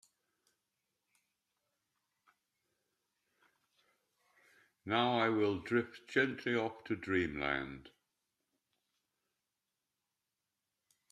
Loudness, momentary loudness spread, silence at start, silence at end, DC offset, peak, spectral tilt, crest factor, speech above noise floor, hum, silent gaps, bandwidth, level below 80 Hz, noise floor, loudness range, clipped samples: -35 LUFS; 10 LU; 4.85 s; 3.25 s; under 0.1%; -16 dBFS; -6 dB/octave; 24 dB; 54 dB; none; none; 11.5 kHz; -70 dBFS; -89 dBFS; 9 LU; under 0.1%